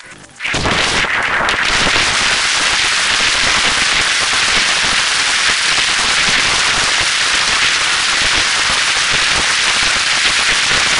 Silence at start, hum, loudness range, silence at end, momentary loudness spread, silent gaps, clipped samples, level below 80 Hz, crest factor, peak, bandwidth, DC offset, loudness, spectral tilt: 0 s; none; 1 LU; 0 s; 2 LU; none; under 0.1%; -36 dBFS; 14 dB; 0 dBFS; 11 kHz; 0.5%; -11 LUFS; 0 dB/octave